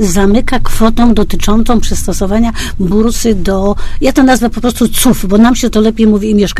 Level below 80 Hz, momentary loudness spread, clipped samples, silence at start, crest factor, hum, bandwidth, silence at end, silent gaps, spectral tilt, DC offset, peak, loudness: -20 dBFS; 6 LU; 0.6%; 0 s; 8 dB; none; 14 kHz; 0 s; none; -5 dB/octave; under 0.1%; 0 dBFS; -11 LUFS